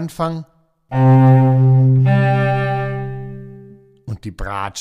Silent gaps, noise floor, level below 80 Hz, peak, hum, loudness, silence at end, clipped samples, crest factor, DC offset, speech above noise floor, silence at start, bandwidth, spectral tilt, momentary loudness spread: none; -42 dBFS; -40 dBFS; -2 dBFS; none; -15 LUFS; 0 s; under 0.1%; 14 dB; under 0.1%; 29 dB; 0 s; 4.7 kHz; -8.5 dB/octave; 19 LU